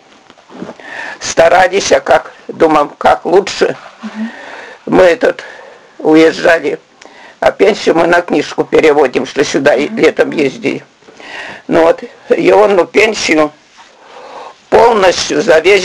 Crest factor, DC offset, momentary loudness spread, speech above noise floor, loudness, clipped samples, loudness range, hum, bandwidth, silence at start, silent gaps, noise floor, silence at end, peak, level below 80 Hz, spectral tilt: 12 dB; under 0.1%; 18 LU; 32 dB; -10 LUFS; 0.4%; 2 LU; none; 11.5 kHz; 0.5 s; none; -42 dBFS; 0 s; 0 dBFS; -44 dBFS; -4 dB/octave